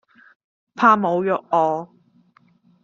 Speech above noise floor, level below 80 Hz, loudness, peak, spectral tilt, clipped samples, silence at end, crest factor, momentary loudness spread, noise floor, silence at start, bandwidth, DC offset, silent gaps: 39 dB; -72 dBFS; -19 LUFS; -2 dBFS; -5 dB/octave; under 0.1%; 1 s; 20 dB; 12 LU; -57 dBFS; 0.75 s; 7.4 kHz; under 0.1%; none